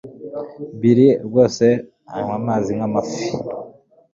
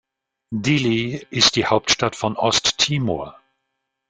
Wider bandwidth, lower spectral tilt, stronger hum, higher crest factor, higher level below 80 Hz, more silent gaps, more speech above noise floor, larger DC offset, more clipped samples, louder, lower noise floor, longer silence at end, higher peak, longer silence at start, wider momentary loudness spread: second, 7.6 kHz vs 10 kHz; first, -7 dB/octave vs -3.5 dB/octave; neither; about the same, 18 dB vs 20 dB; about the same, -56 dBFS vs -52 dBFS; neither; second, 26 dB vs 57 dB; neither; neither; about the same, -18 LUFS vs -19 LUFS; second, -43 dBFS vs -77 dBFS; second, 0.45 s vs 0.8 s; about the same, -2 dBFS vs 0 dBFS; second, 0.05 s vs 0.5 s; first, 18 LU vs 10 LU